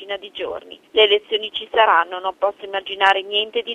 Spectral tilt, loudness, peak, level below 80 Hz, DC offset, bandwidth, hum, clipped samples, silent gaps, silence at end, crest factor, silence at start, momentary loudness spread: -2 dB/octave; -19 LUFS; 0 dBFS; -62 dBFS; under 0.1%; 8.6 kHz; none; under 0.1%; none; 0 s; 20 dB; 0 s; 14 LU